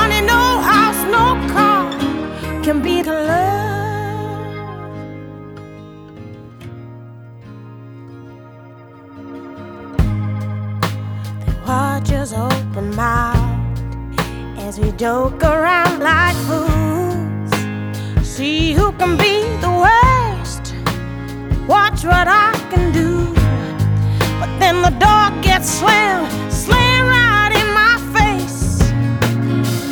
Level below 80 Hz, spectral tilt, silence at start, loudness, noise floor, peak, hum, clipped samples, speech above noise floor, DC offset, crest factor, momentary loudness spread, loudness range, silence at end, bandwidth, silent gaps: -26 dBFS; -5 dB/octave; 0 s; -15 LUFS; -38 dBFS; -2 dBFS; none; under 0.1%; 25 dB; under 0.1%; 14 dB; 21 LU; 18 LU; 0 s; over 20 kHz; none